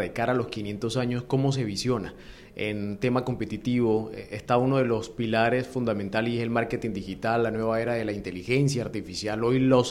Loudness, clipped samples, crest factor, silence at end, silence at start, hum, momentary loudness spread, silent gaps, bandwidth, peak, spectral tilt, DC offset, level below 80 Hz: -27 LUFS; under 0.1%; 18 dB; 0 s; 0 s; none; 8 LU; none; 13 kHz; -8 dBFS; -6 dB/octave; under 0.1%; -52 dBFS